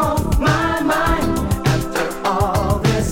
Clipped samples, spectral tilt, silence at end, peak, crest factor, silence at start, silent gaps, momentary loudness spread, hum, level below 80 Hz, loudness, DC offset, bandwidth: under 0.1%; -5.5 dB/octave; 0 s; -4 dBFS; 14 dB; 0 s; none; 3 LU; none; -26 dBFS; -18 LUFS; under 0.1%; 17 kHz